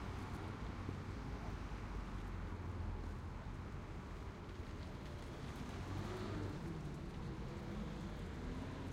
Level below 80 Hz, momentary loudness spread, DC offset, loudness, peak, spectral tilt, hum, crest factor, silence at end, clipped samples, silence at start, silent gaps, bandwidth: -52 dBFS; 5 LU; under 0.1%; -48 LUFS; -30 dBFS; -6.5 dB/octave; none; 16 dB; 0 s; under 0.1%; 0 s; none; 15.5 kHz